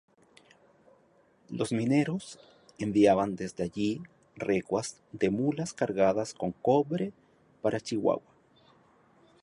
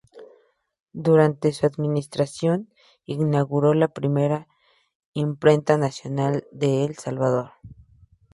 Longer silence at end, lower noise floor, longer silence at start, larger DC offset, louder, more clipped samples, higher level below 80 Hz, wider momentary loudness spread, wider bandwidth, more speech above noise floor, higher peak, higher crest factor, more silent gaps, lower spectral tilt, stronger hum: first, 1.25 s vs 0.6 s; first, -64 dBFS vs -60 dBFS; first, 1.5 s vs 0.15 s; neither; second, -30 LUFS vs -22 LUFS; neither; about the same, -64 dBFS vs -60 dBFS; first, 13 LU vs 10 LU; about the same, 11.5 kHz vs 11.5 kHz; about the same, 36 dB vs 38 dB; second, -10 dBFS vs -2 dBFS; about the same, 20 dB vs 20 dB; second, none vs 0.82-0.86 s, 4.95-5.13 s; second, -6 dB/octave vs -7.5 dB/octave; neither